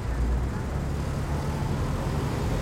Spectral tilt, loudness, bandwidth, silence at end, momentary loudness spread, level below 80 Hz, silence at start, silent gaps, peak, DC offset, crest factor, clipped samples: -7 dB/octave; -29 LUFS; 16 kHz; 0 s; 2 LU; -32 dBFS; 0 s; none; -16 dBFS; under 0.1%; 12 dB; under 0.1%